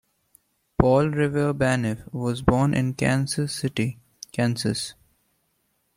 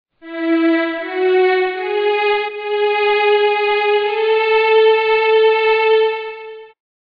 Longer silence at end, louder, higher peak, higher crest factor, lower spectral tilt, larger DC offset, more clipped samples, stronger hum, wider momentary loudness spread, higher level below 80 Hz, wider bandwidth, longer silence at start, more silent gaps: first, 1.05 s vs 0.55 s; second, -24 LUFS vs -15 LUFS; about the same, -2 dBFS vs -2 dBFS; first, 22 dB vs 12 dB; first, -6 dB/octave vs -4.5 dB/octave; neither; neither; neither; about the same, 10 LU vs 8 LU; first, -44 dBFS vs -64 dBFS; first, 16 kHz vs 5.2 kHz; first, 0.8 s vs 0.25 s; neither